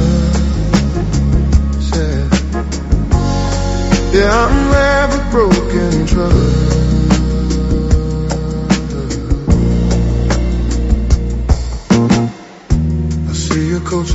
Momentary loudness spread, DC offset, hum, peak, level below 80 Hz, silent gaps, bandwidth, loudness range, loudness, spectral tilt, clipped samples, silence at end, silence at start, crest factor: 6 LU; under 0.1%; none; 0 dBFS; -16 dBFS; none; 8.2 kHz; 3 LU; -14 LUFS; -6.5 dB/octave; under 0.1%; 0 s; 0 s; 12 dB